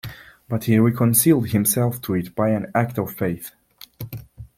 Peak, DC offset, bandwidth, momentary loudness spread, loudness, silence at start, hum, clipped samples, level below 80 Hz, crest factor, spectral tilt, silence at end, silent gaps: -2 dBFS; under 0.1%; 16.5 kHz; 20 LU; -20 LUFS; 0.05 s; none; under 0.1%; -52 dBFS; 18 dB; -5.5 dB/octave; 0.1 s; none